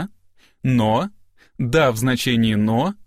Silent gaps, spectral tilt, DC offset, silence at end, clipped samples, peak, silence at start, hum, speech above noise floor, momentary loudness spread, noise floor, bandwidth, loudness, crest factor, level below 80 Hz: none; -6 dB/octave; under 0.1%; 0.05 s; under 0.1%; -4 dBFS; 0 s; none; 36 dB; 10 LU; -54 dBFS; 15.5 kHz; -19 LUFS; 16 dB; -46 dBFS